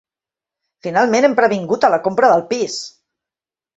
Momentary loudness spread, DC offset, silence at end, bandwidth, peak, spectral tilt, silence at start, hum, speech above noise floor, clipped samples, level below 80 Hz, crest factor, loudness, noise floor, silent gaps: 13 LU; under 0.1%; 0.9 s; 8.2 kHz; -2 dBFS; -4.5 dB/octave; 0.85 s; none; 75 dB; under 0.1%; -62 dBFS; 16 dB; -15 LUFS; -90 dBFS; none